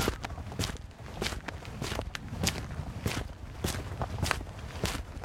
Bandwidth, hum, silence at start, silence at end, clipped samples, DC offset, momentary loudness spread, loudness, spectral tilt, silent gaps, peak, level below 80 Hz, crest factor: 16.5 kHz; none; 0 s; 0 s; under 0.1%; under 0.1%; 8 LU; -36 LUFS; -4 dB/octave; none; -6 dBFS; -44 dBFS; 30 dB